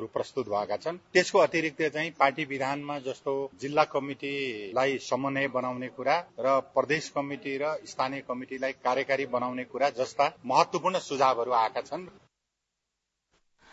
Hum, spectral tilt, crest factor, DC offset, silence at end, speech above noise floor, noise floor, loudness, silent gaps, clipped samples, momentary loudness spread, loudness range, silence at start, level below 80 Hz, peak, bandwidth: none; -4.5 dB/octave; 20 dB; under 0.1%; 1.65 s; 55 dB; -84 dBFS; -29 LUFS; none; under 0.1%; 8 LU; 3 LU; 0 s; -72 dBFS; -8 dBFS; 8 kHz